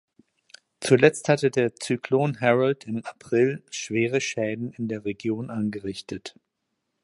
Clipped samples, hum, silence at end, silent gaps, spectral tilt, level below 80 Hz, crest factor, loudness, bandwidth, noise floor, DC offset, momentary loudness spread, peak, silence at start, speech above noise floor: under 0.1%; none; 0.75 s; none; -5.5 dB/octave; -64 dBFS; 24 dB; -25 LUFS; 11.5 kHz; -79 dBFS; under 0.1%; 14 LU; -2 dBFS; 0.8 s; 55 dB